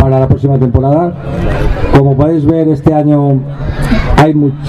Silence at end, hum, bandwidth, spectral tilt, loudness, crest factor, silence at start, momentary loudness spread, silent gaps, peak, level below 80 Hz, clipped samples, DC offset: 0 s; none; 11 kHz; -9 dB/octave; -10 LUFS; 8 dB; 0 s; 7 LU; none; 0 dBFS; -18 dBFS; 0.5%; under 0.1%